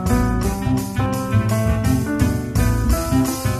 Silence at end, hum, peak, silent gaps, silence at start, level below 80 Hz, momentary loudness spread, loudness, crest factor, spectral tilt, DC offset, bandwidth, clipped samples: 0 s; none; -4 dBFS; none; 0 s; -26 dBFS; 3 LU; -20 LUFS; 14 dB; -6.5 dB/octave; under 0.1%; 14.5 kHz; under 0.1%